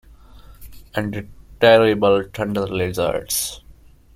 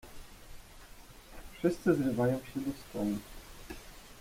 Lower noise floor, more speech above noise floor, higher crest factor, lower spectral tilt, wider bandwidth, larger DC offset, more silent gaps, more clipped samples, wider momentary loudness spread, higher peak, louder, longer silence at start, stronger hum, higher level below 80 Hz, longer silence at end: second, -47 dBFS vs -52 dBFS; first, 28 dB vs 21 dB; about the same, 20 dB vs 20 dB; second, -4 dB/octave vs -6.5 dB/octave; about the same, 16.5 kHz vs 16.5 kHz; neither; neither; neither; second, 15 LU vs 24 LU; first, -2 dBFS vs -16 dBFS; first, -19 LUFS vs -33 LUFS; first, 0.35 s vs 0.05 s; neither; first, -46 dBFS vs -54 dBFS; first, 0.45 s vs 0 s